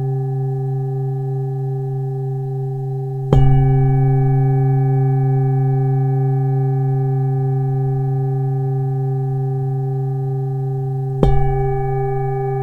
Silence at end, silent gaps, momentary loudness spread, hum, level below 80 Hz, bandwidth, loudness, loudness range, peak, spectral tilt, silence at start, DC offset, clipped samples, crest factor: 0 s; none; 7 LU; none; -30 dBFS; 3.4 kHz; -18 LUFS; 4 LU; 0 dBFS; -11 dB/octave; 0 s; under 0.1%; under 0.1%; 16 dB